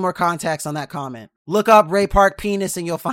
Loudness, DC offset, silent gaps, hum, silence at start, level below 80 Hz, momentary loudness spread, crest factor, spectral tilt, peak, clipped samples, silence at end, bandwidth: -18 LUFS; under 0.1%; 1.36-1.45 s; none; 0 s; -38 dBFS; 16 LU; 18 dB; -5 dB/octave; 0 dBFS; under 0.1%; 0 s; 16.5 kHz